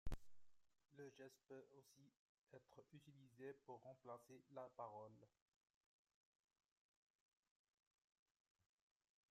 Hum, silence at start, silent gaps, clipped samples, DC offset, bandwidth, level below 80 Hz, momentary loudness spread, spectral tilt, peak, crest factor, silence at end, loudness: none; 0.05 s; 2.19-2.47 s; under 0.1%; under 0.1%; 13.5 kHz; -68 dBFS; 11 LU; -6 dB/octave; -36 dBFS; 24 dB; 4.05 s; -61 LUFS